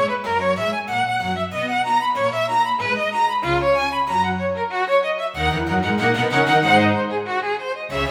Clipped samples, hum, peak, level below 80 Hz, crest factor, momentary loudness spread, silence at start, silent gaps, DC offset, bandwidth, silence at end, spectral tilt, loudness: under 0.1%; none; -4 dBFS; -44 dBFS; 16 dB; 7 LU; 0 s; none; under 0.1%; 16.5 kHz; 0 s; -5 dB/octave; -20 LUFS